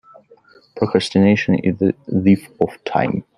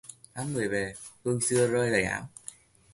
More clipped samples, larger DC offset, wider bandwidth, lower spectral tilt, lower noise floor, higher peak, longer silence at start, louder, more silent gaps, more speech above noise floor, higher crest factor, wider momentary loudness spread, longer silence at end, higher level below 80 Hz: neither; neither; about the same, 11 kHz vs 11.5 kHz; first, -7 dB/octave vs -4.5 dB/octave; about the same, -50 dBFS vs -50 dBFS; first, 0 dBFS vs -10 dBFS; first, 0.75 s vs 0.05 s; first, -18 LUFS vs -28 LUFS; neither; first, 33 dB vs 21 dB; about the same, 18 dB vs 20 dB; second, 7 LU vs 18 LU; second, 0.15 s vs 0.4 s; about the same, -56 dBFS vs -58 dBFS